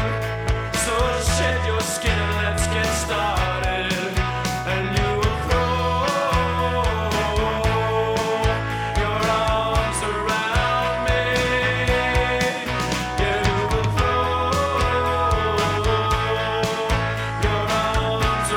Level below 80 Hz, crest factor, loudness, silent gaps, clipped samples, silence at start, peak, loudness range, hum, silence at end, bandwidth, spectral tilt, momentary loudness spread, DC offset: -30 dBFS; 16 dB; -21 LUFS; none; under 0.1%; 0 s; -6 dBFS; 1 LU; none; 0 s; 19.5 kHz; -4.5 dB/octave; 3 LU; under 0.1%